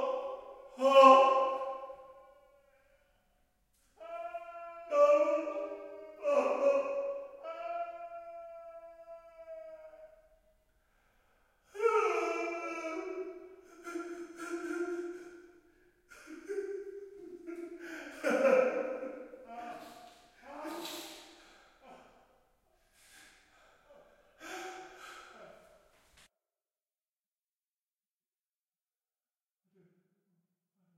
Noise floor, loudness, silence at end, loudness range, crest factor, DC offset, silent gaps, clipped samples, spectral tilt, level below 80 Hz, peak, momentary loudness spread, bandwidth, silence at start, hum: under -90 dBFS; -31 LUFS; 5.45 s; 19 LU; 28 dB; under 0.1%; none; under 0.1%; -3 dB/octave; -76 dBFS; -8 dBFS; 24 LU; 14.5 kHz; 0 s; none